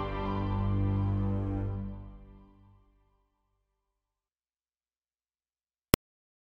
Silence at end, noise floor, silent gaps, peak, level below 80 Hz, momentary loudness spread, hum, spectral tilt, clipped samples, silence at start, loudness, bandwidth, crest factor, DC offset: 4.05 s; under -90 dBFS; none; 0 dBFS; -44 dBFS; 11 LU; none; -6 dB/octave; under 0.1%; 0 s; -32 LUFS; 15 kHz; 34 dB; under 0.1%